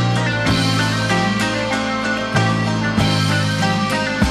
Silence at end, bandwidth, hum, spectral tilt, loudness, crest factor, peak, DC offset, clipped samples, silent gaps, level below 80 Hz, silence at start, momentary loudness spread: 0 s; 13.5 kHz; none; -5 dB/octave; -18 LUFS; 16 dB; -2 dBFS; under 0.1%; under 0.1%; none; -38 dBFS; 0 s; 3 LU